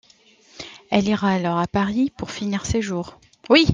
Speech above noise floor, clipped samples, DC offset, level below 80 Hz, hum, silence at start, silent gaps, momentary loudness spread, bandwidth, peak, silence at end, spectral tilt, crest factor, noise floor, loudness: 32 dB; under 0.1%; under 0.1%; -46 dBFS; none; 0.6 s; none; 19 LU; 9.6 kHz; -2 dBFS; 0 s; -5.5 dB/octave; 20 dB; -54 dBFS; -22 LUFS